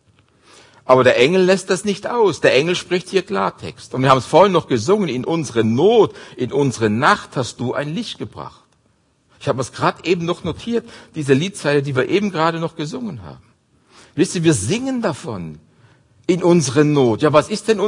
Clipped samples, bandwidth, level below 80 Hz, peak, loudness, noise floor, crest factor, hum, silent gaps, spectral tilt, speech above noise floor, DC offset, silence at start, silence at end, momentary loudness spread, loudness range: under 0.1%; 11 kHz; -56 dBFS; 0 dBFS; -17 LUFS; -60 dBFS; 18 dB; none; none; -5.5 dB/octave; 43 dB; under 0.1%; 0.85 s; 0 s; 15 LU; 6 LU